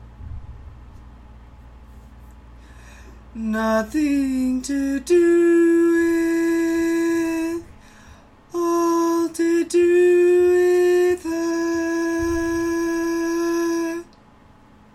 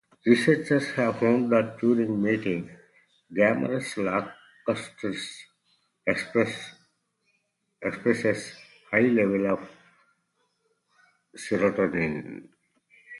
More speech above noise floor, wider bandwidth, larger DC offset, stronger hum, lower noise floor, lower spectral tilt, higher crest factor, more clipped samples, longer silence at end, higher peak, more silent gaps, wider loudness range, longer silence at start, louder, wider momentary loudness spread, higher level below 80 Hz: second, 32 dB vs 50 dB; first, 13 kHz vs 11.5 kHz; neither; neither; second, -50 dBFS vs -75 dBFS; about the same, -5 dB/octave vs -6 dB/octave; second, 12 dB vs 20 dB; neither; first, 0.9 s vs 0 s; about the same, -8 dBFS vs -6 dBFS; neither; about the same, 7 LU vs 6 LU; second, 0 s vs 0.25 s; first, -19 LUFS vs -26 LUFS; second, 11 LU vs 16 LU; first, -46 dBFS vs -64 dBFS